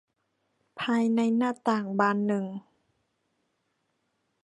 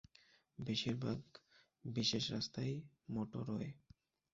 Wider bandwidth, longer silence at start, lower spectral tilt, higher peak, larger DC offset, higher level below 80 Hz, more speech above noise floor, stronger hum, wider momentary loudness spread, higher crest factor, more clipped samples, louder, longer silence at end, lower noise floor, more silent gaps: first, 10.5 kHz vs 7.6 kHz; first, 0.75 s vs 0.6 s; first, -6.5 dB/octave vs -5 dB/octave; first, -10 dBFS vs -24 dBFS; neither; second, -78 dBFS vs -70 dBFS; first, 50 dB vs 29 dB; neither; second, 10 LU vs 15 LU; about the same, 20 dB vs 20 dB; neither; first, -27 LUFS vs -42 LUFS; first, 1.85 s vs 0.55 s; first, -77 dBFS vs -71 dBFS; neither